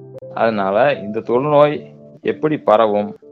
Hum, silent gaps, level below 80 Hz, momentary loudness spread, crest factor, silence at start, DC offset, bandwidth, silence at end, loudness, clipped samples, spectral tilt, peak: none; none; -62 dBFS; 11 LU; 16 dB; 0 s; under 0.1%; 4.8 kHz; 0.15 s; -17 LUFS; under 0.1%; -8.5 dB/octave; 0 dBFS